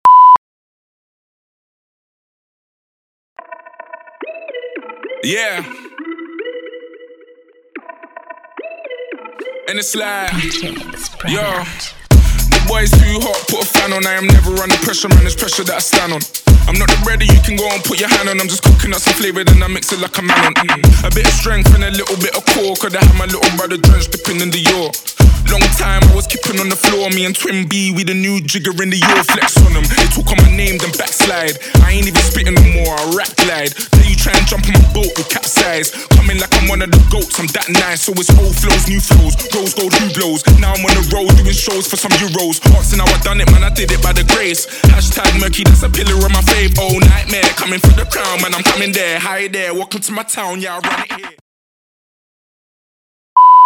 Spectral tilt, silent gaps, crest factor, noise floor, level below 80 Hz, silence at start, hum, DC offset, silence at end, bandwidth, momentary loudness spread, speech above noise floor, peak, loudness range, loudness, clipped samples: -4 dB/octave; 0.38-3.36 s, 51.41-53.36 s; 12 dB; -46 dBFS; -14 dBFS; 0.05 s; none; under 0.1%; 0 s; 19.5 kHz; 10 LU; 35 dB; 0 dBFS; 12 LU; -12 LUFS; 0.1%